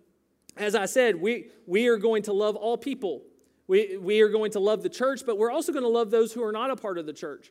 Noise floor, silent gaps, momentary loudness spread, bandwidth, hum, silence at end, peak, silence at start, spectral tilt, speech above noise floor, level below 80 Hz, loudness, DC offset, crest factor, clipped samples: -59 dBFS; none; 10 LU; 15.5 kHz; none; 0.15 s; -8 dBFS; 0.55 s; -4 dB/octave; 34 dB; -80 dBFS; -26 LUFS; under 0.1%; 18 dB; under 0.1%